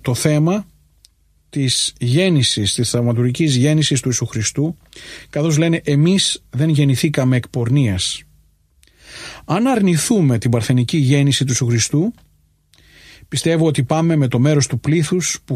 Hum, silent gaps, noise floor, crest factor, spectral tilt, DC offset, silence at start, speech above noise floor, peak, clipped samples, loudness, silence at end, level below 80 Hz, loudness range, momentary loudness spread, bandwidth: none; none; -56 dBFS; 16 dB; -5 dB/octave; under 0.1%; 0.05 s; 40 dB; -2 dBFS; under 0.1%; -16 LUFS; 0 s; -48 dBFS; 2 LU; 8 LU; 15 kHz